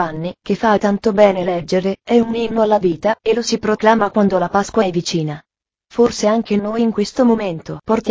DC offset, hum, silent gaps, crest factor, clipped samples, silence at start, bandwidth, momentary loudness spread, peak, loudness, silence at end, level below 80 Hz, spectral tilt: under 0.1%; none; none; 16 dB; under 0.1%; 0 s; 8 kHz; 8 LU; 0 dBFS; -16 LUFS; 0 s; -48 dBFS; -5.5 dB/octave